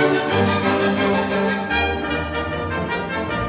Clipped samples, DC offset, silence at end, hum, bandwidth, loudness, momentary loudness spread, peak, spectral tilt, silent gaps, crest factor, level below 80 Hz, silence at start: under 0.1%; under 0.1%; 0 s; none; 4 kHz; -20 LUFS; 6 LU; -4 dBFS; -10 dB/octave; none; 16 dB; -36 dBFS; 0 s